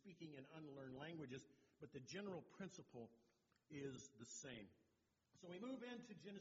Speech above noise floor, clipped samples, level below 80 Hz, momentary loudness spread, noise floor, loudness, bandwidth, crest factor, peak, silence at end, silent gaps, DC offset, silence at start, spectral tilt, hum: 29 dB; under 0.1%; -88 dBFS; 8 LU; -85 dBFS; -57 LUFS; 7.4 kHz; 18 dB; -38 dBFS; 0 s; none; under 0.1%; 0.05 s; -5 dB/octave; none